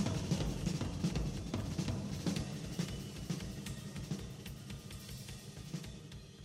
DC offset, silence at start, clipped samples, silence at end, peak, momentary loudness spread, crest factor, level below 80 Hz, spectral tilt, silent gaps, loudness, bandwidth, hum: under 0.1%; 0 s; under 0.1%; 0 s; -22 dBFS; 11 LU; 18 dB; -50 dBFS; -5.5 dB/octave; none; -41 LUFS; 16 kHz; none